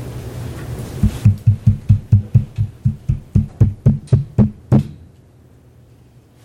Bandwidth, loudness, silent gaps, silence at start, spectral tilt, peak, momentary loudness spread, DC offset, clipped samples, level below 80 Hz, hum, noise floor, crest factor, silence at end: 11 kHz; -17 LUFS; none; 0 s; -9.5 dB/octave; 0 dBFS; 14 LU; under 0.1%; under 0.1%; -30 dBFS; none; -47 dBFS; 16 dB; 1.5 s